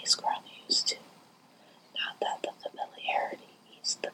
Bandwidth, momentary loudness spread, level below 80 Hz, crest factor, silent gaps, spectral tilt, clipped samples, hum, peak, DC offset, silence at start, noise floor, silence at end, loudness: 17 kHz; 13 LU; under -90 dBFS; 24 dB; none; 0.5 dB/octave; under 0.1%; none; -10 dBFS; under 0.1%; 0 s; -59 dBFS; 0 s; -32 LUFS